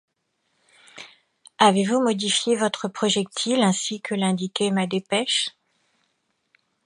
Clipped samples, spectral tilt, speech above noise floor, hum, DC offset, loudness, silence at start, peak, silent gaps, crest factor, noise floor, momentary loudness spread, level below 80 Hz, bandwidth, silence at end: under 0.1%; -3.5 dB/octave; 51 dB; none; under 0.1%; -22 LUFS; 0.95 s; -2 dBFS; none; 22 dB; -73 dBFS; 8 LU; -74 dBFS; 11 kHz; 1.35 s